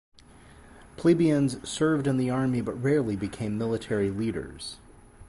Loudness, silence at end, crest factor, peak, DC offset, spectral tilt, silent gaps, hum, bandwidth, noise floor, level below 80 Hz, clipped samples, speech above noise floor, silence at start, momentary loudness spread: -27 LUFS; 0.05 s; 18 dB; -10 dBFS; under 0.1%; -6.5 dB/octave; none; none; 11.5 kHz; -52 dBFS; -52 dBFS; under 0.1%; 26 dB; 0.55 s; 13 LU